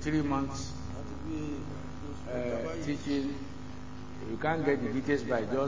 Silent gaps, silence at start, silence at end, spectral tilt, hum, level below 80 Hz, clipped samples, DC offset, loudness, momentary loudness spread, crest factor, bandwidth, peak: none; 0 s; 0 s; -6.5 dB/octave; none; -48 dBFS; under 0.1%; 0.8%; -34 LUFS; 13 LU; 18 dB; 7.6 kHz; -14 dBFS